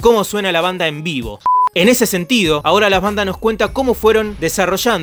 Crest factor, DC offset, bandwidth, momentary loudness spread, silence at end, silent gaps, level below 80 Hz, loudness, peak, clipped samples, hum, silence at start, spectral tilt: 14 dB; under 0.1%; over 20 kHz; 6 LU; 0 s; none; -36 dBFS; -15 LUFS; 0 dBFS; under 0.1%; none; 0 s; -4 dB/octave